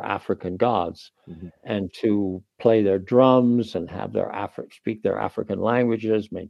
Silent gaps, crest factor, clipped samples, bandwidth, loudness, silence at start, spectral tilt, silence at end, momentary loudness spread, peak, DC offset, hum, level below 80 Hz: none; 20 dB; under 0.1%; 9.2 kHz; -23 LUFS; 0 s; -8.5 dB/octave; 0 s; 15 LU; -2 dBFS; under 0.1%; none; -60 dBFS